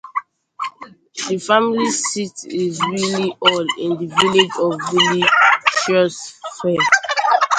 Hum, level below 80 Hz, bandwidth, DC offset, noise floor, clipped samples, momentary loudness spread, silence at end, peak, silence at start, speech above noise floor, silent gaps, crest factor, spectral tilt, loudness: none; -62 dBFS; 11 kHz; under 0.1%; -40 dBFS; under 0.1%; 15 LU; 0 s; 0 dBFS; 0.05 s; 23 dB; none; 18 dB; -3 dB/octave; -16 LUFS